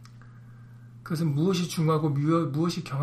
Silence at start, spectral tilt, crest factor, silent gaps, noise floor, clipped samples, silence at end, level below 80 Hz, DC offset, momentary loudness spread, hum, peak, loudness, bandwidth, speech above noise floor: 0 s; -7 dB/octave; 14 dB; none; -47 dBFS; under 0.1%; 0 s; -62 dBFS; under 0.1%; 5 LU; none; -14 dBFS; -26 LUFS; 15.5 kHz; 22 dB